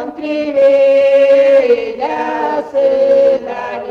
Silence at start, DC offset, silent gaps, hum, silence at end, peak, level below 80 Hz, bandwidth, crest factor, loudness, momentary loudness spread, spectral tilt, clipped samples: 0 s; under 0.1%; none; none; 0 s; -2 dBFS; -54 dBFS; 6.6 kHz; 10 dB; -12 LUFS; 10 LU; -5 dB/octave; under 0.1%